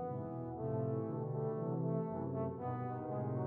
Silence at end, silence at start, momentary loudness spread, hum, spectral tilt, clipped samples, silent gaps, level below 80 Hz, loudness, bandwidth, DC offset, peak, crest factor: 0 s; 0 s; 4 LU; none; -12 dB/octave; under 0.1%; none; -70 dBFS; -40 LUFS; 2.8 kHz; under 0.1%; -24 dBFS; 14 dB